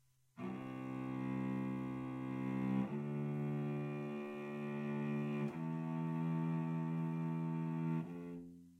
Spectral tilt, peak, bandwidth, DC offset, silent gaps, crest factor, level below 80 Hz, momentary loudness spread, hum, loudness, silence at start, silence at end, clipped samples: -9.5 dB/octave; -26 dBFS; 7.4 kHz; under 0.1%; none; 14 dB; -76 dBFS; 7 LU; none; -41 LUFS; 0.35 s; 0 s; under 0.1%